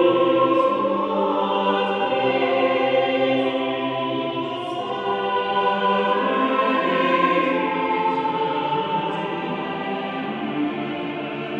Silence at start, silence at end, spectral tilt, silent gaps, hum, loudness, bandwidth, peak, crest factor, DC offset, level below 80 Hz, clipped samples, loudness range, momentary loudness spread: 0 s; 0 s; -7 dB/octave; none; none; -22 LUFS; 7.4 kHz; -6 dBFS; 14 dB; under 0.1%; -66 dBFS; under 0.1%; 4 LU; 8 LU